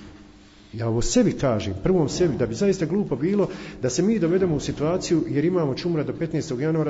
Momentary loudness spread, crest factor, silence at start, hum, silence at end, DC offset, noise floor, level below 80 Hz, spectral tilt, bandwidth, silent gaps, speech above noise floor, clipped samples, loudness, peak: 6 LU; 16 dB; 0 s; none; 0 s; under 0.1%; -49 dBFS; -42 dBFS; -6 dB/octave; 8 kHz; none; 26 dB; under 0.1%; -23 LUFS; -8 dBFS